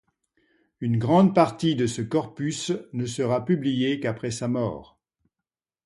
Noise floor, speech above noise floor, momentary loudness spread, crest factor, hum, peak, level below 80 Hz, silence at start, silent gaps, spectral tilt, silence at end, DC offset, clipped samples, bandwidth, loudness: -89 dBFS; 65 dB; 11 LU; 22 dB; none; -4 dBFS; -60 dBFS; 0.8 s; none; -6 dB/octave; 1 s; under 0.1%; under 0.1%; 11.5 kHz; -25 LUFS